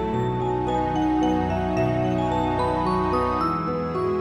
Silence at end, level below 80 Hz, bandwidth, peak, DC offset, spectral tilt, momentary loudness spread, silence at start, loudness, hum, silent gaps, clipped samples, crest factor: 0 s; -40 dBFS; 11.5 kHz; -10 dBFS; under 0.1%; -8 dB/octave; 3 LU; 0 s; -23 LUFS; none; none; under 0.1%; 12 dB